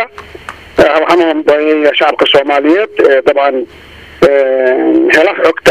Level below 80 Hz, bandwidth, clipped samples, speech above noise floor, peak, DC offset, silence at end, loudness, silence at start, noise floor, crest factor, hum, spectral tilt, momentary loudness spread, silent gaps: -42 dBFS; 14 kHz; 0.6%; 21 dB; 0 dBFS; 0.3%; 0 s; -9 LUFS; 0 s; -29 dBFS; 10 dB; none; -4.5 dB/octave; 12 LU; none